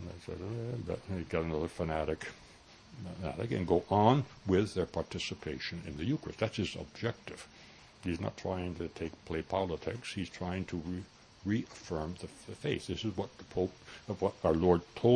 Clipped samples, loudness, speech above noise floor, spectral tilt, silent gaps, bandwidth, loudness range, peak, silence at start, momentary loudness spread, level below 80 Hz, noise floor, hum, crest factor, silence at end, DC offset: under 0.1%; -35 LUFS; 23 dB; -6.5 dB/octave; none; 10.5 kHz; 6 LU; -10 dBFS; 0 s; 16 LU; -56 dBFS; -57 dBFS; none; 24 dB; 0 s; under 0.1%